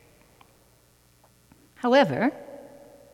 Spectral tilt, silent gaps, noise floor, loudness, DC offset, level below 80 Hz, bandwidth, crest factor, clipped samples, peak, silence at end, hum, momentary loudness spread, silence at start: -6 dB/octave; none; -60 dBFS; -23 LUFS; under 0.1%; -68 dBFS; 15 kHz; 22 dB; under 0.1%; -8 dBFS; 0.5 s; none; 24 LU; 1.85 s